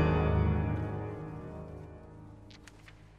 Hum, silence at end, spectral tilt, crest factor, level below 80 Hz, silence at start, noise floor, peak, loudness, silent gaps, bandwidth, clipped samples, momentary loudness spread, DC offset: none; 0.05 s; -9 dB/octave; 16 dB; -40 dBFS; 0 s; -54 dBFS; -16 dBFS; -33 LUFS; none; 7.2 kHz; under 0.1%; 24 LU; under 0.1%